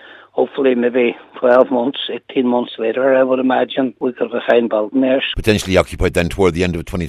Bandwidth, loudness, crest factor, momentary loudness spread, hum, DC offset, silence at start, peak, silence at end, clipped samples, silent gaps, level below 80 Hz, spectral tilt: 14 kHz; -16 LUFS; 16 dB; 7 LU; none; under 0.1%; 0.05 s; 0 dBFS; 0 s; under 0.1%; none; -36 dBFS; -6 dB/octave